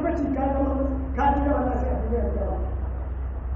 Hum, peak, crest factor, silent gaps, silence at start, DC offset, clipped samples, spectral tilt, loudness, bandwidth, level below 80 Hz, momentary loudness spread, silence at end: none; -10 dBFS; 14 dB; none; 0 s; under 0.1%; under 0.1%; -8.5 dB/octave; -26 LUFS; 3.3 kHz; -28 dBFS; 9 LU; 0 s